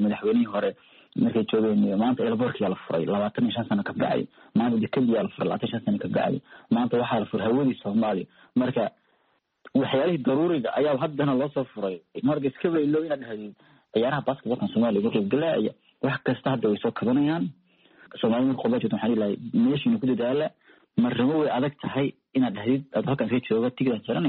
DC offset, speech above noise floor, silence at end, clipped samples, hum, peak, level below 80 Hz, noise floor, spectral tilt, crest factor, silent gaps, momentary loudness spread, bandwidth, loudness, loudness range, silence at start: under 0.1%; 45 dB; 0 s; under 0.1%; none; -10 dBFS; -66 dBFS; -70 dBFS; -6 dB/octave; 16 dB; none; 6 LU; 4.4 kHz; -26 LUFS; 2 LU; 0 s